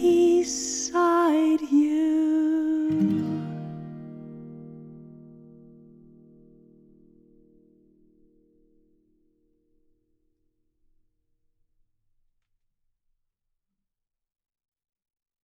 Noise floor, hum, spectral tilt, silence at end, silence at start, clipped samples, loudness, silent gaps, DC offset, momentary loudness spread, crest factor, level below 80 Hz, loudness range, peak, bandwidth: -86 dBFS; none; -5 dB/octave; 10.35 s; 0 s; under 0.1%; -23 LUFS; none; under 0.1%; 22 LU; 16 dB; -66 dBFS; 24 LU; -12 dBFS; 12.5 kHz